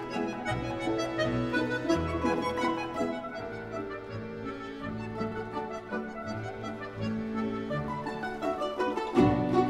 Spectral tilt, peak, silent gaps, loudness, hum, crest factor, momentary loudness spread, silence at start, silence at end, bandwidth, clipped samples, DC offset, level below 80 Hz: -6.5 dB/octave; -10 dBFS; none; -32 LUFS; none; 20 dB; 10 LU; 0 s; 0 s; 13 kHz; under 0.1%; under 0.1%; -52 dBFS